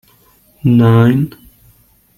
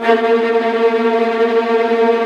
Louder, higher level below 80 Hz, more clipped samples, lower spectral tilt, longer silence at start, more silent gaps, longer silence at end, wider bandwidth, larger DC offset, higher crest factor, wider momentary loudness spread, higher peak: about the same, -12 LUFS vs -14 LUFS; first, -46 dBFS vs -62 dBFS; neither; first, -9.5 dB/octave vs -5 dB/octave; first, 0.65 s vs 0 s; neither; first, 0.9 s vs 0 s; first, 13.5 kHz vs 7 kHz; neither; about the same, 12 dB vs 12 dB; first, 10 LU vs 2 LU; about the same, -2 dBFS vs 0 dBFS